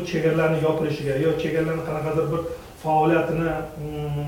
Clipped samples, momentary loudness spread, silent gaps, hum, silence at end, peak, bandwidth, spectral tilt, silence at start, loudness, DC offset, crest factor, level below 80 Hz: under 0.1%; 10 LU; none; none; 0 s; -8 dBFS; 17 kHz; -7.5 dB/octave; 0 s; -23 LUFS; under 0.1%; 14 dB; -46 dBFS